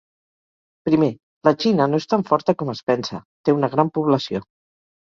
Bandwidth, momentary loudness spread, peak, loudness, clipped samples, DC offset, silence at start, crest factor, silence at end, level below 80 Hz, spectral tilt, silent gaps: 7.4 kHz; 7 LU; -2 dBFS; -20 LUFS; under 0.1%; under 0.1%; 0.85 s; 20 dB; 0.6 s; -60 dBFS; -7 dB/octave; 1.23-1.41 s, 3.25-3.44 s